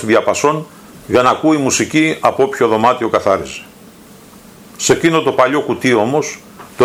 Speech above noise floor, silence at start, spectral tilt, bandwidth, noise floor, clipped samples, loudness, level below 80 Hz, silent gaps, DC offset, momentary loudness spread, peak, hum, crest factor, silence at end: 26 dB; 0 s; -4 dB/octave; 16 kHz; -40 dBFS; under 0.1%; -14 LUFS; -52 dBFS; none; under 0.1%; 12 LU; 0 dBFS; none; 14 dB; 0 s